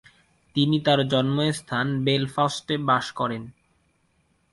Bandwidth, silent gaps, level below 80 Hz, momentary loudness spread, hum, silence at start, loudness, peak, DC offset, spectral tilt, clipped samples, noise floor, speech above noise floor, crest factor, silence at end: 11.5 kHz; none; -60 dBFS; 8 LU; none; 0.55 s; -24 LUFS; -6 dBFS; under 0.1%; -5.5 dB/octave; under 0.1%; -67 dBFS; 44 dB; 18 dB; 1 s